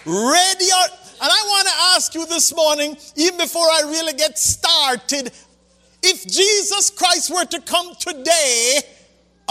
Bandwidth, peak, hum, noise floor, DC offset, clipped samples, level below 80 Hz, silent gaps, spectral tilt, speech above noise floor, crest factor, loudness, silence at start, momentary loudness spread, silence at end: 16 kHz; -2 dBFS; none; -55 dBFS; under 0.1%; under 0.1%; -54 dBFS; none; 0 dB/octave; 38 dB; 16 dB; -15 LUFS; 0.05 s; 8 LU; 0.65 s